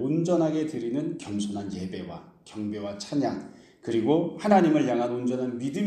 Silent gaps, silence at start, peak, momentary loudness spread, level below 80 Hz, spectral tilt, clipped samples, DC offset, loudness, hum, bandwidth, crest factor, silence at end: none; 0 s; -6 dBFS; 16 LU; -66 dBFS; -6.5 dB/octave; under 0.1%; under 0.1%; -27 LUFS; none; 9.8 kHz; 20 dB; 0 s